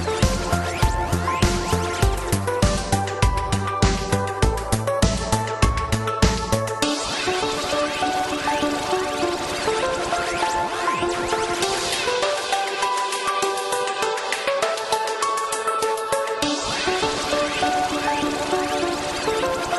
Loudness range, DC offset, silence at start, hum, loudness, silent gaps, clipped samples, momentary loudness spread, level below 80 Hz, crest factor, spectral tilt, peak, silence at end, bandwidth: 1 LU; under 0.1%; 0 s; none; -22 LUFS; none; under 0.1%; 3 LU; -32 dBFS; 18 dB; -4 dB/octave; -4 dBFS; 0 s; 13 kHz